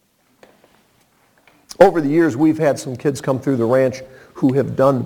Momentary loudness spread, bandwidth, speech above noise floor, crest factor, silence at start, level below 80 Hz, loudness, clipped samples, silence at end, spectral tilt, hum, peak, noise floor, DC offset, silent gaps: 8 LU; 18 kHz; 42 dB; 18 dB; 1.8 s; -54 dBFS; -17 LUFS; under 0.1%; 0 s; -7 dB/octave; none; 0 dBFS; -58 dBFS; under 0.1%; none